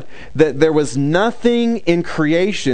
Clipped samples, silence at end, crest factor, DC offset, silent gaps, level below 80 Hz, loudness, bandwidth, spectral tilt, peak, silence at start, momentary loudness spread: under 0.1%; 0 s; 16 dB; 4%; none; -44 dBFS; -16 LUFS; 9.4 kHz; -6 dB/octave; 0 dBFS; 0 s; 3 LU